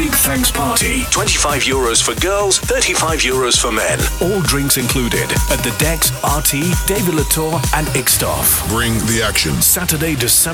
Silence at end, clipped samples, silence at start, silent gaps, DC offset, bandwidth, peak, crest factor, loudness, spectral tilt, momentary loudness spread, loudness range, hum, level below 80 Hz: 0 s; under 0.1%; 0 s; none; under 0.1%; 20 kHz; -2 dBFS; 12 dB; -14 LUFS; -3 dB/octave; 4 LU; 1 LU; none; -26 dBFS